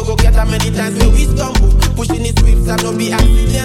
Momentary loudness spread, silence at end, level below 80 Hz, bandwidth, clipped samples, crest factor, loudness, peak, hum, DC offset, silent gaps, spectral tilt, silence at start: 3 LU; 0 s; -12 dBFS; 15 kHz; under 0.1%; 10 dB; -14 LUFS; 0 dBFS; none; under 0.1%; none; -5 dB/octave; 0 s